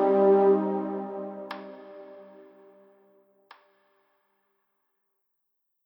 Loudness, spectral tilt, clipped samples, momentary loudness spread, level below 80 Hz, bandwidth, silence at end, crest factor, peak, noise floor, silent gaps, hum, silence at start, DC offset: -24 LUFS; -10 dB/octave; under 0.1%; 26 LU; -88 dBFS; 5.4 kHz; 3.65 s; 18 dB; -10 dBFS; -79 dBFS; none; none; 0 s; under 0.1%